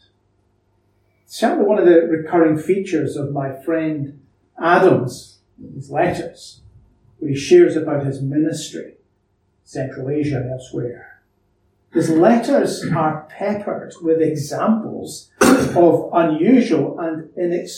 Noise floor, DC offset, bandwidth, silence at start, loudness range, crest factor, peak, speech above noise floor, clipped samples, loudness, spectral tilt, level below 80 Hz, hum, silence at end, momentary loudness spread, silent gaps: -64 dBFS; under 0.1%; 16.5 kHz; 1.3 s; 7 LU; 18 dB; 0 dBFS; 47 dB; under 0.1%; -18 LUFS; -6 dB/octave; -56 dBFS; none; 0 s; 15 LU; none